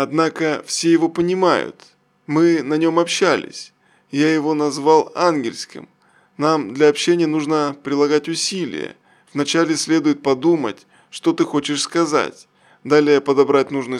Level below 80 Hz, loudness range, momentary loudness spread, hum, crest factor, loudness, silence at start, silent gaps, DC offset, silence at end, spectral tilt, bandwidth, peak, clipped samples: -68 dBFS; 2 LU; 12 LU; none; 18 dB; -18 LUFS; 0 s; none; under 0.1%; 0 s; -4.5 dB/octave; 12 kHz; -2 dBFS; under 0.1%